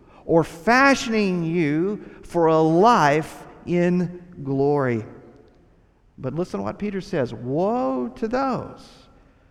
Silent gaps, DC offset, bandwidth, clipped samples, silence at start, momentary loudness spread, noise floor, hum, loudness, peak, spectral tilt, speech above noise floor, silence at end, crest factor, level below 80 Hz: none; under 0.1%; 13.5 kHz; under 0.1%; 0.25 s; 14 LU; -57 dBFS; none; -21 LUFS; -4 dBFS; -6.5 dB/octave; 35 dB; 0.65 s; 18 dB; -52 dBFS